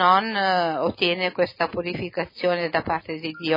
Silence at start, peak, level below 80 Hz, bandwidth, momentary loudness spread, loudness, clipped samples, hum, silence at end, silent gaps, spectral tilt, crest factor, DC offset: 0 s; -6 dBFS; -58 dBFS; 5.4 kHz; 8 LU; -24 LUFS; under 0.1%; none; 0 s; none; -6.5 dB/octave; 18 dB; under 0.1%